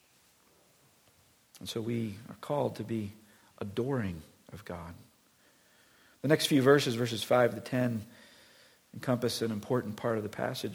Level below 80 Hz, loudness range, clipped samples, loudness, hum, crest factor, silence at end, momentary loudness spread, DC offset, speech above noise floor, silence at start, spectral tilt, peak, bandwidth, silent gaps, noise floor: -68 dBFS; 9 LU; under 0.1%; -31 LUFS; none; 24 dB; 0 s; 19 LU; under 0.1%; 35 dB; 1.55 s; -5.5 dB/octave; -10 dBFS; 19.5 kHz; none; -66 dBFS